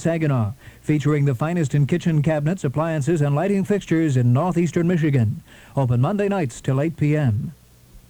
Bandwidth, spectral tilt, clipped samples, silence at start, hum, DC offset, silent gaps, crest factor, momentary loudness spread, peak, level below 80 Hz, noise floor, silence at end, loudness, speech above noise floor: 11.5 kHz; -8 dB/octave; under 0.1%; 0 s; none; under 0.1%; none; 12 dB; 5 LU; -8 dBFS; -50 dBFS; -48 dBFS; 0.1 s; -21 LUFS; 28 dB